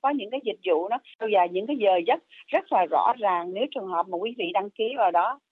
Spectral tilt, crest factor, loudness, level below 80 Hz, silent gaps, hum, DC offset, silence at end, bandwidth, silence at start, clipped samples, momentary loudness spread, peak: -7 dB/octave; 16 dB; -25 LUFS; -86 dBFS; 1.15-1.19 s; none; under 0.1%; 0.15 s; 4.4 kHz; 0.05 s; under 0.1%; 7 LU; -10 dBFS